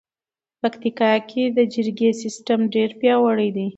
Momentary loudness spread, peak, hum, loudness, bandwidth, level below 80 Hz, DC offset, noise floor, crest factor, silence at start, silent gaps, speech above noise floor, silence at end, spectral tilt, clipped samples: 6 LU; -4 dBFS; none; -20 LUFS; 8.2 kHz; -70 dBFS; under 0.1%; under -90 dBFS; 16 dB; 0.65 s; none; over 70 dB; 0.05 s; -5.5 dB/octave; under 0.1%